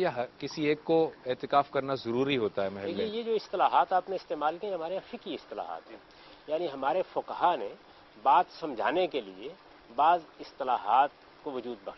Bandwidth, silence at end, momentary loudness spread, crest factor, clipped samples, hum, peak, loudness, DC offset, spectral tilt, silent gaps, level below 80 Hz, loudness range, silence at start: 6.2 kHz; 0 s; 14 LU; 20 dB; under 0.1%; none; -10 dBFS; -30 LUFS; under 0.1%; -6 dB/octave; none; -70 dBFS; 5 LU; 0 s